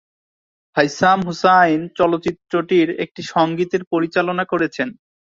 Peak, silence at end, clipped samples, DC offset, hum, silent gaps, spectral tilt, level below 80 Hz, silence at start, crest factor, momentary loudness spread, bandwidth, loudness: 0 dBFS; 0.3 s; under 0.1%; under 0.1%; none; 3.87-3.91 s; -5.5 dB/octave; -58 dBFS; 0.75 s; 18 dB; 9 LU; 7.6 kHz; -18 LUFS